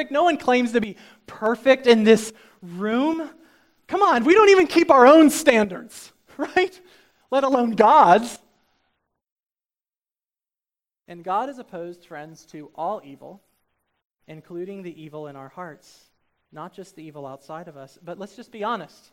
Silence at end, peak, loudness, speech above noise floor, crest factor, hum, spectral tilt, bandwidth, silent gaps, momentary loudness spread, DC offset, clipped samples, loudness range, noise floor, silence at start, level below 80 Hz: 0.25 s; 0 dBFS; -18 LUFS; over 70 dB; 22 dB; none; -4.5 dB/octave; 16.5 kHz; 9.32-9.36 s; 26 LU; under 0.1%; under 0.1%; 23 LU; under -90 dBFS; 0 s; -64 dBFS